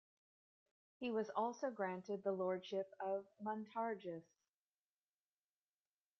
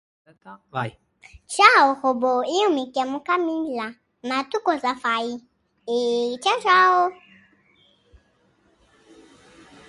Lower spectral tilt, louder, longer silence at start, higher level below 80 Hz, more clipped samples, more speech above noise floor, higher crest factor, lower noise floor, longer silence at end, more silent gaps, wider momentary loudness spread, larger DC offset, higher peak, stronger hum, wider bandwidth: about the same, -4.5 dB/octave vs -3.5 dB/octave; second, -44 LUFS vs -21 LUFS; first, 1 s vs 0.45 s; second, under -90 dBFS vs -64 dBFS; neither; first, over 47 dB vs 41 dB; about the same, 20 dB vs 24 dB; first, under -90 dBFS vs -63 dBFS; second, 2 s vs 2.75 s; neither; second, 7 LU vs 16 LU; neither; second, -26 dBFS vs 0 dBFS; first, 50 Hz at -75 dBFS vs none; second, 6.8 kHz vs 11.5 kHz